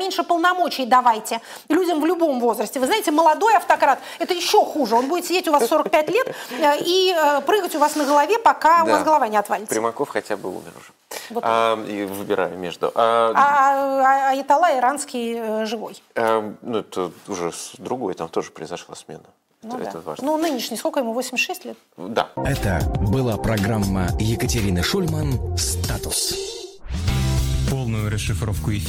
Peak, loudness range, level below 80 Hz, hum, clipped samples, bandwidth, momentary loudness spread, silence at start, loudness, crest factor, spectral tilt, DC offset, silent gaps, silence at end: -4 dBFS; 8 LU; -36 dBFS; none; under 0.1%; 16.5 kHz; 12 LU; 0 s; -20 LUFS; 16 dB; -4.5 dB/octave; under 0.1%; none; 0 s